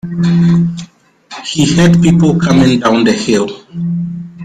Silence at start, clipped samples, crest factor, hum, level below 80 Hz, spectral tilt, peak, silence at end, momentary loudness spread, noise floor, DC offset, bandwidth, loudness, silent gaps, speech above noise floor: 0.05 s; under 0.1%; 10 dB; none; -40 dBFS; -6 dB/octave; 0 dBFS; 0 s; 13 LU; -37 dBFS; under 0.1%; 9.4 kHz; -11 LUFS; none; 28 dB